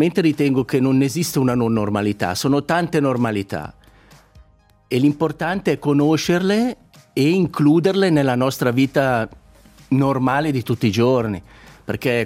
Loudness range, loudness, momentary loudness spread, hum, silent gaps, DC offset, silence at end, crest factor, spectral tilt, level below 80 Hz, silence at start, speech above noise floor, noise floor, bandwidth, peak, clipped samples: 4 LU; -19 LUFS; 8 LU; none; none; under 0.1%; 0 s; 16 dB; -6 dB/octave; -52 dBFS; 0 s; 34 dB; -52 dBFS; 16 kHz; -2 dBFS; under 0.1%